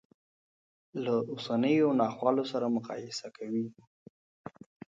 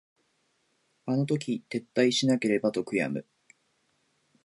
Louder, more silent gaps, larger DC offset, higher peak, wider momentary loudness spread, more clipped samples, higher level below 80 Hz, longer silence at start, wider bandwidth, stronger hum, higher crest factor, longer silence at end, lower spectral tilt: second, -31 LUFS vs -28 LUFS; first, 3.87-4.44 s vs none; neither; about the same, -12 dBFS vs -12 dBFS; first, 21 LU vs 9 LU; neither; about the same, -78 dBFS vs -74 dBFS; about the same, 0.95 s vs 1.05 s; second, 7.8 kHz vs 11.5 kHz; neither; about the same, 20 dB vs 20 dB; second, 0.4 s vs 1.25 s; about the same, -6 dB/octave vs -5 dB/octave